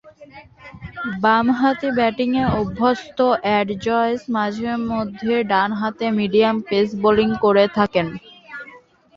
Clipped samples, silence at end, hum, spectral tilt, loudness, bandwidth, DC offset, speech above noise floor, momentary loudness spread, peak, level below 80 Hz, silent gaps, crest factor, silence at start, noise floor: under 0.1%; 0.4 s; none; -7 dB/octave; -19 LUFS; 7.4 kHz; under 0.1%; 28 dB; 12 LU; -2 dBFS; -48 dBFS; none; 18 dB; 0.05 s; -46 dBFS